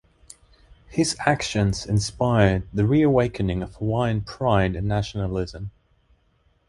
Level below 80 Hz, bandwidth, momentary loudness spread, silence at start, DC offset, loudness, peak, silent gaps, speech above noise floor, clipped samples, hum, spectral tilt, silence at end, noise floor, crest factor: -40 dBFS; 11.5 kHz; 9 LU; 0.9 s; under 0.1%; -23 LUFS; -4 dBFS; none; 42 dB; under 0.1%; none; -6 dB/octave; 1 s; -64 dBFS; 20 dB